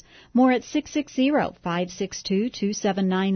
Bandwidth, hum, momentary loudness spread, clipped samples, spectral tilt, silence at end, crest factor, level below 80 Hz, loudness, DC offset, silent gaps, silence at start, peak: 6.6 kHz; none; 8 LU; under 0.1%; -5.5 dB/octave; 0 s; 16 dB; -58 dBFS; -24 LUFS; under 0.1%; none; 0.35 s; -8 dBFS